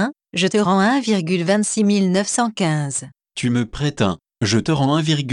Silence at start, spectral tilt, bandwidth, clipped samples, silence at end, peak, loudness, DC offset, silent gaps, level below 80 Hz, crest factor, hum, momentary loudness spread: 0 s; -5 dB/octave; 11 kHz; under 0.1%; 0 s; -6 dBFS; -19 LUFS; under 0.1%; none; -50 dBFS; 14 dB; none; 7 LU